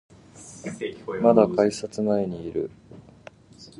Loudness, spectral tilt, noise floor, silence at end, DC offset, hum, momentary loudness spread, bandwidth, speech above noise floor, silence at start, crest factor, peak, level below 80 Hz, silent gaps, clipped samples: -24 LUFS; -6.5 dB/octave; -49 dBFS; 0.15 s; under 0.1%; none; 19 LU; 11.5 kHz; 26 dB; 0.35 s; 22 dB; -4 dBFS; -58 dBFS; none; under 0.1%